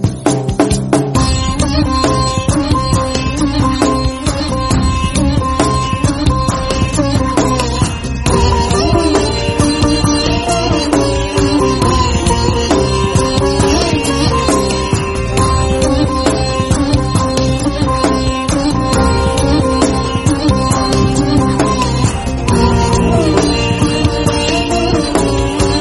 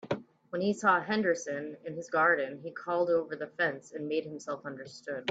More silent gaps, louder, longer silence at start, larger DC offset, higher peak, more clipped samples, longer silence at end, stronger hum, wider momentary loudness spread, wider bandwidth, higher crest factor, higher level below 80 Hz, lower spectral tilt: neither; first, -13 LUFS vs -31 LUFS; about the same, 0 s vs 0.05 s; neither; first, 0 dBFS vs -12 dBFS; neither; about the same, 0 s vs 0 s; neither; second, 3 LU vs 14 LU; first, 11.5 kHz vs 8 kHz; second, 12 dB vs 18 dB; first, -22 dBFS vs -78 dBFS; about the same, -5 dB/octave vs -5 dB/octave